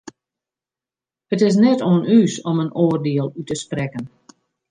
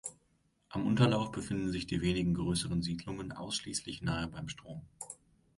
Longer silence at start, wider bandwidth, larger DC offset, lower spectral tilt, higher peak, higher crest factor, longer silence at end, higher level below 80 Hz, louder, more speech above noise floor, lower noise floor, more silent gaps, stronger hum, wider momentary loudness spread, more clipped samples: first, 1.3 s vs 0.05 s; second, 9.8 kHz vs 11.5 kHz; neither; first, -7 dB/octave vs -5 dB/octave; first, -4 dBFS vs -12 dBFS; second, 16 dB vs 22 dB; first, 0.65 s vs 0.45 s; second, -60 dBFS vs -54 dBFS; first, -18 LUFS vs -34 LUFS; first, 73 dB vs 39 dB; first, -90 dBFS vs -73 dBFS; neither; neither; second, 13 LU vs 17 LU; neither